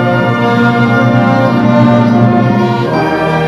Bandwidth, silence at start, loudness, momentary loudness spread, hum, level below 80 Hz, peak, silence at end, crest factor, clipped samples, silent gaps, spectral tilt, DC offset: 11.5 kHz; 0 s; -9 LUFS; 4 LU; none; -42 dBFS; 0 dBFS; 0 s; 8 dB; under 0.1%; none; -8 dB/octave; under 0.1%